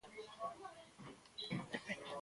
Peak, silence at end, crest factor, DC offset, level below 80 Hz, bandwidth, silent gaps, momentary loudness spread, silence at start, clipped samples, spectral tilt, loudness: -28 dBFS; 0 s; 22 dB; under 0.1%; -78 dBFS; 11.5 kHz; none; 12 LU; 0.05 s; under 0.1%; -4.5 dB/octave; -49 LUFS